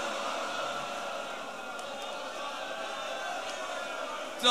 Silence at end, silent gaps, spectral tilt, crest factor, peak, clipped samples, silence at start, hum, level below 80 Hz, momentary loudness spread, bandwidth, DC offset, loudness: 0 s; none; -1 dB/octave; 26 dB; -10 dBFS; under 0.1%; 0 s; none; -76 dBFS; 5 LU; 15.5 kHz; 0.2%; -35 LUFS